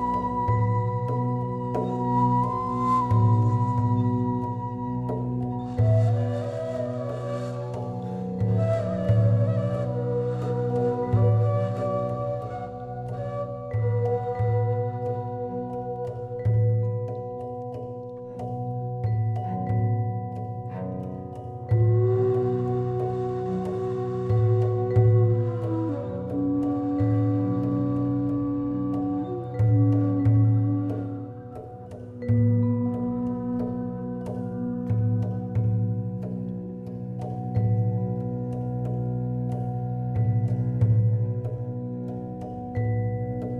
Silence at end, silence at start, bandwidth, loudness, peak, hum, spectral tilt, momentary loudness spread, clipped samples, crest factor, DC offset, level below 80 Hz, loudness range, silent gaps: 0 s; 0 s; 4.5 kHz; -26 LUFS; -10 dBFS; none; -11 dB/octave; 12 LU; under 0.1%; 16 dB; under 0.1%; -46 dBFS; 5 LU; none